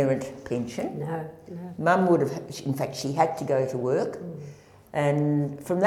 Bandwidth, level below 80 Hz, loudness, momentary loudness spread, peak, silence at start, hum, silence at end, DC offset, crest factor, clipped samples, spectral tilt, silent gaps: 15.5 kHz; -64 dBFS; -27 LUFS; 16 LU; -8 dBFS; 0 s; none; 0 s; under 0.1%; 18 dB; under 0.1%; -7 dB/octave; none